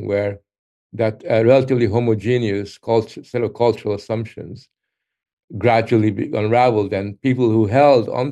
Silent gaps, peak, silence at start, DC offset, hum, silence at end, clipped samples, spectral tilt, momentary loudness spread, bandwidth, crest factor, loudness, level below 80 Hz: 0.59-0.90 s, 5.33-5.37 s, 5.44-5.48 s; 0 dBFS; 0 s; under 0.1%; none; 0 s; under 0.1%; -8 dB/octave; 12 LU; 9.4 kHz; 18 dB; -18 LUFS; -60 dBFS